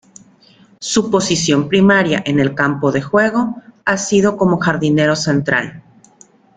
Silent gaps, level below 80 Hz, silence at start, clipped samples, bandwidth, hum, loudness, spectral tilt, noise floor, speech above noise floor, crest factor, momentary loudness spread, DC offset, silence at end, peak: none; -50 dBFS; 0.8 s; under 0.1%; 9.4 kHz; none; -15 LUFS; -5 dB/octave; -48 dBFS; 34 dB; 14 dB; 7 LU; under 0.1%; 0.75 s; -2 dBFS